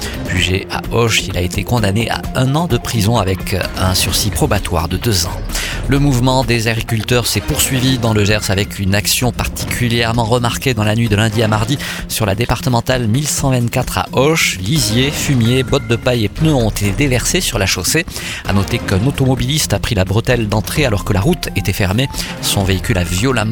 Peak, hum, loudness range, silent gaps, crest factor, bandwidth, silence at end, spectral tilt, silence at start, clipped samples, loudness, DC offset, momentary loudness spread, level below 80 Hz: 0 dBFS; none; 1 LU; none; 14 dB; 19 kHz; 0 s; -4.5 dB/octave; 0 s; under 0.1%; -15 LUFS; under 0.1%; 5 LU; -28 dBFS